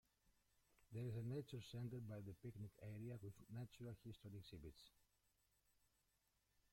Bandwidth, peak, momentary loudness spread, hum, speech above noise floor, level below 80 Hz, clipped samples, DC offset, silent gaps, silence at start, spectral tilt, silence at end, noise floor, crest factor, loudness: 16.5 kHz; -40 dBFS; 9 LU; none; 32 dB; -76 dBFS; under 0.1%; under 0.1%; none; 0.8 s; -7.5 dB/octave; 1.8 s; -86 dBFS; 16 dB; -55 LUFS